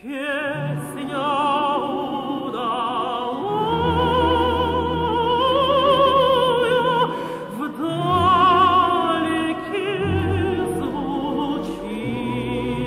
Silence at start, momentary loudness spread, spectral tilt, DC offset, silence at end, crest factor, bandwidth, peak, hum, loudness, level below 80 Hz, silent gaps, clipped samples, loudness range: 0.05 s; 11 LU; -6 dB/octave; under 0.1%; 0 s; 14 dB; 16 kHz; -6 dBFS; none; -20 LUFS; -42 dBFS; none; under 0.1%; 5 LU